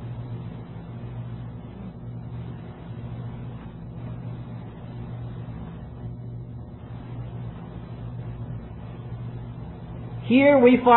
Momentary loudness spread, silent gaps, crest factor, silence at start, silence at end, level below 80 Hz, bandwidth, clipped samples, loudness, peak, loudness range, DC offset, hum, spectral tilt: 13 LU; none; 22 dB; 0 s; 0 s; -46 dBFS; 4.2 kHz; under 0.1%; -28 LUFS; -4 dBFS; 10 LU; under 0.1%; none; -11 dB/octave